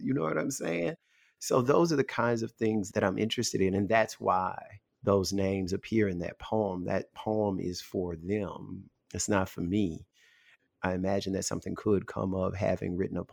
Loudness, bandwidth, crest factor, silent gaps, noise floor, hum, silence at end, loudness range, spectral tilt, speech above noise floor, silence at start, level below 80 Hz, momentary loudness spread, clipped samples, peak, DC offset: -31 LUFS; 19.5 kHz; 20 dB; none; -65 dBFS; none; 0.05 s; 5 LU; -5.5 dB/octave; 35 dB; 0 s; -60 dBFS; 9 LU; under 0.1%; -10 dBFS; under 0.1%